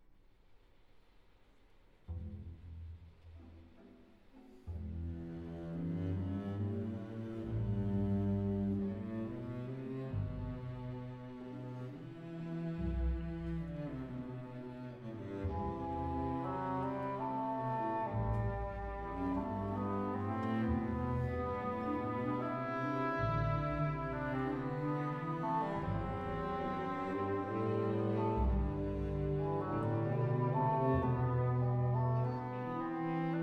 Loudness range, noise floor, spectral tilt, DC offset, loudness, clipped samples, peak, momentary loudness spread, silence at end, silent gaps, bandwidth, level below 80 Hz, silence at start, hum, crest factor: 11 LU; -64 dBFS; -10 dB/octave; under 0.1%; -38 LUFS; under 0.1%; -22 dBFS; 13 LU; 0 s; none; 6.2 kHz; -50 dBFS; 0.1 s; none; 16 dB